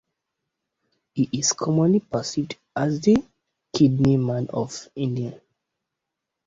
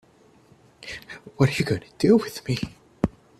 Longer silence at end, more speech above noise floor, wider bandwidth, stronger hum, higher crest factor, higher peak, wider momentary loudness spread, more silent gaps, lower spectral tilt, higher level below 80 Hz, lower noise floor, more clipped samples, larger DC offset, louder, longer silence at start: first, 1.1 s vs 0.3 s; first, 62 dB vs 33 dB; second, 8 kHz vs 14.5 kHz; neither; about the same, 18 dB vs 20 dB; about the same, -6 dBFS vs -4 dBFS; second, 11 LU vs 18 LU; neither; about the same, -5.5 dB/octave vs -6.5 dB/octave; second, -56 dBFS vs -50 dBFS; first, -83 dBFS vs -56 dBFS; neither; neither; about the same, -23 LUFS vs -24 LUFS; first, 1.15 s vs 0.8 s